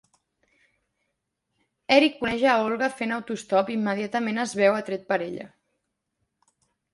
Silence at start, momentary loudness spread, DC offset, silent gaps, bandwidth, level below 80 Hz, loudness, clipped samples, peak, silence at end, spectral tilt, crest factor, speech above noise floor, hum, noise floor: 1.9 s; 10 LU; under 0.1%; none; 11.5 kHz; -66 dBFS; -24 LUFS; under 0.1%; -4 dBFS; 1.45 s; -4.5 dB/octave; 24 dB; 55 dB; none; -79 dBFS